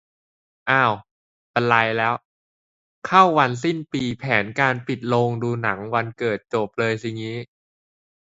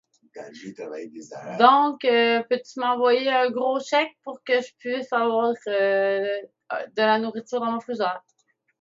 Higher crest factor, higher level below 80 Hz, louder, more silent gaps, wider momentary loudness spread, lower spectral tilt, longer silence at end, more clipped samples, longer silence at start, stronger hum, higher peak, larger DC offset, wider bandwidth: about the same, 22 dB vs 22 dB; first, -60 dBFS vs -82 dBFS; about the same, -21 LUFS vs -23 LUFS; first, 1.11-1.54 s, 2.25-3.02 s vs none; second, 13 LU vs 18 LU; first, -6 dB/octave vs -4 dB/octave; first, 0.85 s vs 0.6 s; neither; first, 0.65 s vs 0.35 s; neither; about the same, 0 dBFS vs 0 dBFS; neither; about the same, 8 kHz vs 7.8 kHz